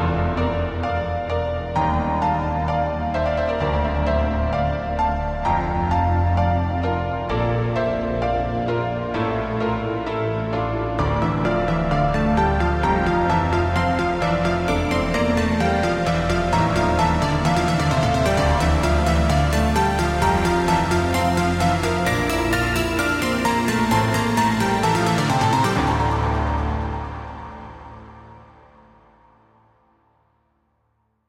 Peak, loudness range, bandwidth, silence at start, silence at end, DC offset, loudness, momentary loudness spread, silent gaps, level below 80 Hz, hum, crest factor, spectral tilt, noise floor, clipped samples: -6 dBFS; 4 LU; 16.5 kHz; 0 s; 2.9 s; under 0.1%; -21 LUFS; 5 LU; none; -30 dBFS; none; 14 dB; -6 dB/octave; -68 dBFS; under 0.1%